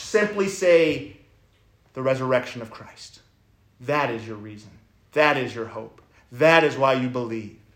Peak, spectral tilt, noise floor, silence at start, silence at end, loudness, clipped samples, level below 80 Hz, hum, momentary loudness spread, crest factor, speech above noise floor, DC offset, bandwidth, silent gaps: -2 dBFS; -5 dB/octave; -60 dBFS; 0 s; 0.25 s; -22 LUFS; under 0.1%; -62 dBFS; none; 24 LU; 22 dB; 37 dB; under 0.1%; 16 kHz; none